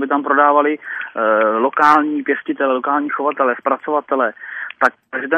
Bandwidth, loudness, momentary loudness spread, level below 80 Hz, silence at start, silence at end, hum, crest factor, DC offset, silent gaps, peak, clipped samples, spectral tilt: 10 kHz; -16 LUFS; 9 LU; -72 dBFS; 0 s; 0 s; none; 16 dB; under 0.1%; none; 0 dBFS; under 0.1%; -5.5 dB/octave